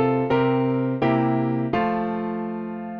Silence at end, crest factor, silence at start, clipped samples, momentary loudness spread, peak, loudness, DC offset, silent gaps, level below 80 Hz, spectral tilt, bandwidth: 0 s; 14 dB; 0 s; under 0.1%; 8 LU; -8 dBFS; -23 LUFS; under 0.1%; none; -54 dBFS; -9.5 dB/octave; 5.4 kHz